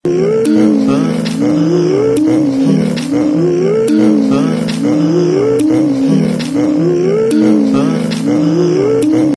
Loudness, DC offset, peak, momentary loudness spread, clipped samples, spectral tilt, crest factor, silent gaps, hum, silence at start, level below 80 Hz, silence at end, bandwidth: -12 LUFS; under 0.1%; 0 dBFS; 4 LU; under 0.1%; -7 dB/octave; 10 dB; none; none; 0.05 s; -50 dBFS; 0 s; 11 kHz